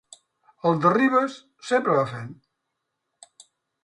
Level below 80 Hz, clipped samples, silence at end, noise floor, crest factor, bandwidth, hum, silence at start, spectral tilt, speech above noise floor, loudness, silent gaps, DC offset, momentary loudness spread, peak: -70 dBFS; under 0.1%; 1.5 s; -80 dBFS; 20 dB; 11 kHz; none; 0.65 s; -6.5 dB/octave; 58 dB; -22 LUFS; none; under 0.1%; 18 LU; -6 dBFS